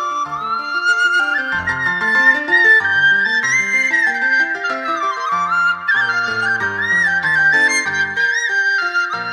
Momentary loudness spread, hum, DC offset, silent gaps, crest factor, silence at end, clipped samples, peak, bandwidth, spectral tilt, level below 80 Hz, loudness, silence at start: 8 LU; none; under 0.1%; none; 14 dB; 0 s; under 0.1%; -2 dBFS; 13.5 kHz; -1.5 dB/octave; -56 dBFS; -14 LUFS; 0 s